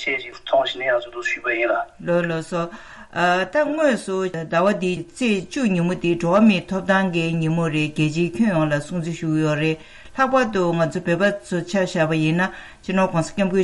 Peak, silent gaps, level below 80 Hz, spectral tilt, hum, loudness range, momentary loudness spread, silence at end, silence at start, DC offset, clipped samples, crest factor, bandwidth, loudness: -6 dBFS; none; -52 dBFS; -6 dB/octave; none; 2 LU; 7 LU; 0 s; 0 s; under 0.1%; under 0.1%; 14 dB; 11.5 kHz; -21 LUFS